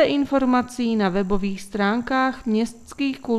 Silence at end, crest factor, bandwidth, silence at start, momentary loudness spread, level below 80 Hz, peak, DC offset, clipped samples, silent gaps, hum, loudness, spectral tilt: 0 s; 16 dB; 13 kHz; 0 s; 7 LU; -46 dBFS; -4 dBFS; under 0.1%; under 0.1%; none; none; -22 LUFS; -6 dB/octave